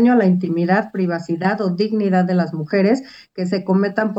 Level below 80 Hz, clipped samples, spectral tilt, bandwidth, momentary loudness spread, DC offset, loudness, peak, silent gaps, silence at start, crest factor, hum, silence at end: -70 dBFS; under 0.1%; -8 dB/octave; 7.8 kHz; 6 LU; under 0.1%; -18 LUFS; -2 dBFS; none; 0 s; 14 dB; none; 0 s